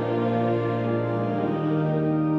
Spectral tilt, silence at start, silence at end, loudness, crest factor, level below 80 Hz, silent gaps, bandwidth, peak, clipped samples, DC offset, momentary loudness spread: -10 dB/octave; 0 s; 0 s; -25 LUFS; 12 dB; -58 dBFS; none; 5.8 kHz; -12 dBFS; under 0.1%; under 0.1%; 2 LU